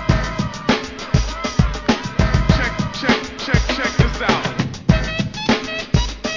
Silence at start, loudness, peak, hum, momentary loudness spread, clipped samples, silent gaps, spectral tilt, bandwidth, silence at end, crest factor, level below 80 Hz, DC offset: 0 s; -19 LUFS; 0 dBFS; none; 4 LU; under 0.1%; none; -5.5 dB/octave; 7.6 kHz; 0 s; 18 dB; -26 dBFS; under 0.1%